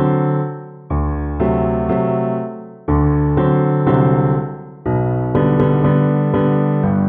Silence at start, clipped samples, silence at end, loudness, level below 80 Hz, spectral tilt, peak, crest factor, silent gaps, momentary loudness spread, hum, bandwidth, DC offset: 0 s; under 0.1%; 0 s; -17 LUFS; -30 dBFS; -12.5 dB/octave; -2 dBFS; 14 dB; none; 10 LU; none; 3.7 kHz; under 0.1%